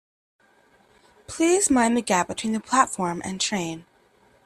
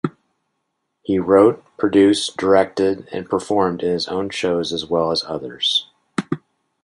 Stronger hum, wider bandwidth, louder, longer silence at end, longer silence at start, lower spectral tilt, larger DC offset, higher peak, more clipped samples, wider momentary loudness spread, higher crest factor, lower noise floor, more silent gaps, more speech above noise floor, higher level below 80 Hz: neither; first, 14 kHz vs 11.5 kHz; second, -23 LUFS vs -19 LUFS; first, 0.65 s vs 0.45 s; first, 1.3 s vs 0.05 s; second, -3 dB/octave vs -5 dB/octave; neither; about the same, -4 dBFS vs -2 dBFS; neither; second, 11 LU vs 14 LU; about the same, 22 dB vs 18 dB; second, -59 dBFS vs -74 dBFS; neither; second, 37 dB vs 56 dB; about the same, -58 dBFS vs -54 dBFS